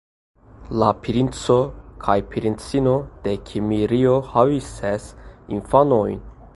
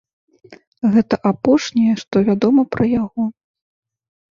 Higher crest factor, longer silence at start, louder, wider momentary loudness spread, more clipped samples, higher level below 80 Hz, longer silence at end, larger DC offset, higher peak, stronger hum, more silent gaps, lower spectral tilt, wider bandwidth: about the same, 20 dB vs 16 dB; about the same, 0.6 s vs 0.5 s; second, -21 LUFS vs -17 LUFS; first, 11 LU vs 7 LU; neither; first, -42 dBFS vs -52 dBFS; second, 0.1 s vs 1 s; neither; about the same, 0 dBFS vs -2 dBFS; neither; second, none vs 0.67-0.72 s; about the same, -7 dB/octave vs -7 dB/octave; first, 11.5 kHz vs 7.4 kHz